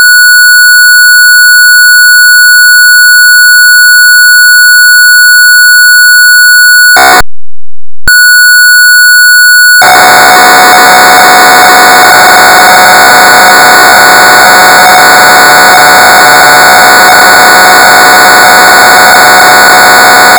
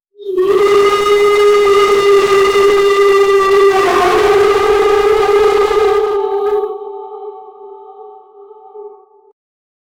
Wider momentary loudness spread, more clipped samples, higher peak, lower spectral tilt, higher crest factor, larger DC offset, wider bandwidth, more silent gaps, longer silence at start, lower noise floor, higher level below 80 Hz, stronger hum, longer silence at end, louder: second, 1 LU vs 11 LU; first, 50% vs under 0.1%; first, 0 dBFS vs -4 dBFS; second, 0 dB/octave vs -3.5 dB/octave; second, 0 dB vs 8 dB; first, 0.4% vs under 0.1%; first, over 20 kHz vs 15.5 kHz; neither; second, 0 s vs 0.2 s; first, under -90 dBFS vs -38 dBFS; first, -34 dBFS vs -42 dBFS; neither; second, 0 s vs 1.05 s; first, 1 LUFS vs -10 LUFS